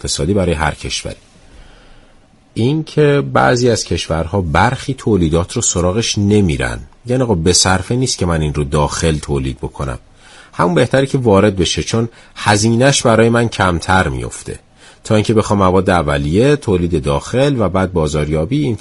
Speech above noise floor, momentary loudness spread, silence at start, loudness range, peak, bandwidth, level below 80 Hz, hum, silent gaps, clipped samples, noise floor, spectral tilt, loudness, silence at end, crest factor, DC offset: 33 dB; 11 LU; 0.05 s; 4 LU; 0 dBFS; 11.5 kHz; -32 dBFS; none; none; under 0.1%; -47 dBFS; -5 dB/octave; -14 LUFS; 0.05 s; 14 dB; under 0.1%